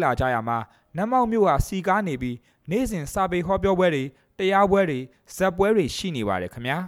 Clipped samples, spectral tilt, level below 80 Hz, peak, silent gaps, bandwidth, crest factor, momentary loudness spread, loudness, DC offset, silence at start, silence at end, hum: under 0.1%; -6 dB/octave; -42 dBFS; -8 dBFS; none; 16.5 kHz; 16 dB; 10 LU; -23 LUFS; under 0.1%; 0 s; 0 s; none